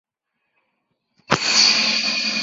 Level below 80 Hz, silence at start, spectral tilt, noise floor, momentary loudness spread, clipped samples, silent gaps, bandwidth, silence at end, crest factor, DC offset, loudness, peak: -60 dBFS; 1.3 s; -0.5 dB/octave; -76 dBFS; 8 LU; under 0.1%; none; 8 kHz; 0 s; 20 dB; under 0.1%; -16 LUFS; -2 dBFS